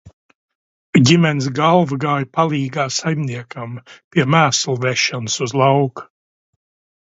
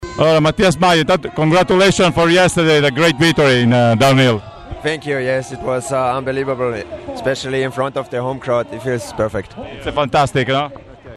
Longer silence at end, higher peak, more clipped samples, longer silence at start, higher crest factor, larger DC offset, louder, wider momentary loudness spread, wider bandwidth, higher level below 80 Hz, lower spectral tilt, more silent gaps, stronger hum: first, 1 s vs 0 s; about the same, 0 dBFS vs -2 dBFS; neither; about the same, 0.05 s vs 0 s; about the same, 18 dB vs 14 dB; neither; about the same, -17 LUFS vs -15 LUFS; first, 14 LU vs 11 LU; second, 8 kHz vs 14.5 kHz; second, -58 dBFS vs -40 dBFS; about the same, -5 dB/octave vs -5 dB/octave; first, 0.13-0.29 s, 0.35-0.48 s, 0.55-0.93 s, 4.04-4.11 s vs none; neither